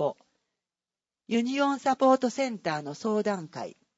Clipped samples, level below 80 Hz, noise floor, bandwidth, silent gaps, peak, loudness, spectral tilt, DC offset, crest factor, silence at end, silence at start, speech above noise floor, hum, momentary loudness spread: under 0.1%; -80 dBFS; under -90 dBFS; 8 kHz; none; -10 dBFS; -27 LUFS; -5 dB/octave; under 0.1%; 18 dB; 0.3 s; 0 s; over 63 dB; none; 10 LU